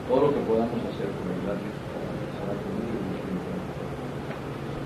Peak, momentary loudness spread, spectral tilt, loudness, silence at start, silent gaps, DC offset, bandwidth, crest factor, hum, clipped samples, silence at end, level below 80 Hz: -10 dBFS; 10 LU; -7.5 dB/octave; -30 LUFS; 0 s; none; under 0.1%; 14 kHz; 18 dB; none; under 0.1%; 0 s; -48 dBFS